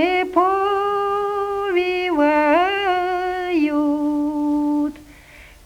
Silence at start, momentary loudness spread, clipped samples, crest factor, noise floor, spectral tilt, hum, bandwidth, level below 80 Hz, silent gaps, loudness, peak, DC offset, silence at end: 0 s; 6 LU; under 0.1%; 16 dB; -44 dBFS; -5 dB/octave; none; 12.5 kHz; -50 dBFS; none; -19 LUFS; -4 dBFS; under 0.1%; 0.2 s